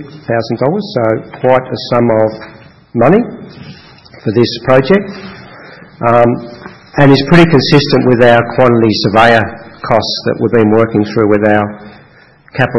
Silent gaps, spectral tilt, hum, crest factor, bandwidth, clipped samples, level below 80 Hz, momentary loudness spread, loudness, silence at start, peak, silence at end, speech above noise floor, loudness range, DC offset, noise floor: none; -7 dB/octave; none; 10 dB; 10.5 kHz; 1%; -40 dBFS; 15 LU; -10 LUFS; 0 s; 0 dBFS; 0 s; 33 dB; 5 LU; under 0.1%; -42 dBFS